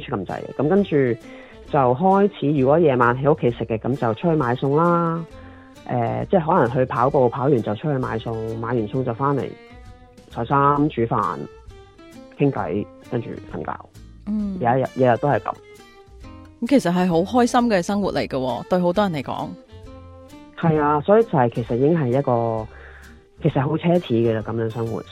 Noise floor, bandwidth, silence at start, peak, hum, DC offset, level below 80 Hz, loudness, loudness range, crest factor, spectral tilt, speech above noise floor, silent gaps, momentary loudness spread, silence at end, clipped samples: -45 dBFS; 13.5 kHz; 0 s; -4 dBFS; none; under 0.1%; -48 dBFS; -21 LUFS; 5 LU; 18 dB; -7.5 dB/octave; 25 dB; none; 13 LU; 0 s; under 0.1%